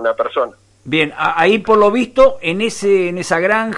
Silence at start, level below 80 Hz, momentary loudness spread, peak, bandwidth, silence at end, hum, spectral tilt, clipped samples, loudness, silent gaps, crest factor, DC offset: 0 s; -46 dBFS; 7 LU; -2 dBFS; 11.5 kHz; 0 s; none; -4.5 dB/octave; under 0.1%; -15 LUFS; none; 14 dB; under 0.1%